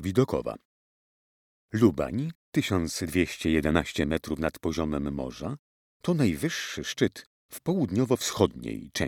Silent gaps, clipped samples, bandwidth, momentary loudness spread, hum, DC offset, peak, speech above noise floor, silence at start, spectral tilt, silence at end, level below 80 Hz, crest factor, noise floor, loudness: 0.65-1.69 s, 2.35-2.52 s, 5.59-6.00 s, 7.26-7.49 s; under 0.1%; 18 kHz; 12 LU; none; under 0.1%; -6 dBFS; over 63 dB; 0 s; -5.5 dB/octave; 0 s; -48 dBFS; 22 dB; under -90 dBFS; -28 LUFS